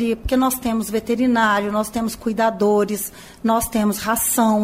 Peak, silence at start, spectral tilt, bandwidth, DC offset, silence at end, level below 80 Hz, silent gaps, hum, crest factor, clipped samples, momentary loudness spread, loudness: -4 dBFS; 0 s; -4 dB/octave; 16 kHz; under 0.1%; 0 s; -42 dBFS; none; none; 14 dB; under 0.1%; 7 LU; -19 LUFS